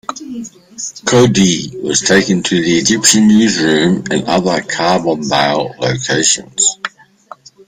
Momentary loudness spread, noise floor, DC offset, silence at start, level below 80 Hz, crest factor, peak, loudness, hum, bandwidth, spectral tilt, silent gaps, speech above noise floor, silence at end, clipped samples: 16 LU; -39 dBFS; under 0.1%; 0.1 s; -48 dBFS; 14 dB; 0 dBFS; -12 LUFS; none; 16 kHz; -3.5 dB/octave; none; 26 dB; 0.8 s; under 0.1%